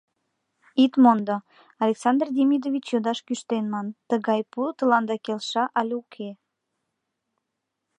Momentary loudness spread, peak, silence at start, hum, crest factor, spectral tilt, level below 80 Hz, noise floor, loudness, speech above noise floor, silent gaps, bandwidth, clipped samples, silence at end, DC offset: 12 LU; -6 dBFS; 0.75 s; none; 20 dB; -5.5 dB/octave; -82 dBFS; -81 dBFS; -24 LUFS; 58 dB; none; 9.8 kHz; under 0.1%; 1.65 s; under 0.1%